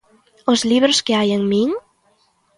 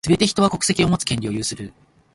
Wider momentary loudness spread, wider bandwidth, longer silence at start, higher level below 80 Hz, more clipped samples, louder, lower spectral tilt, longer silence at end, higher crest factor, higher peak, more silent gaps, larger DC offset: second, 9 LU vs 12 LU; about the same, 11.5 kHz vs 11.5 kHz; first, 0.45 s vs 0.05 s; second, -60 dBFS vs -44 dBFS; neither; first, -17 LUFS vs -20 LUFS; about the same, -4 dB/octave vs -4.5 dB/octave; first, 0.8 s vs 0.45 s; about the same, 18 dB vs 20 dB; about the same, 0 dBFS vs -2 dBFS; neither; neither